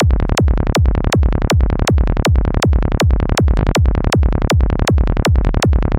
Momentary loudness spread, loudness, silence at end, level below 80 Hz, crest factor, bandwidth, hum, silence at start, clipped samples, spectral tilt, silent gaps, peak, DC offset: 1 LU; -15 LUFS; 0 s; -16 dBFS; 8 dB; 16 kHz; none; 0 s; under 0.1%; -6 dB/octave; none; -4 dBFS; 0.5%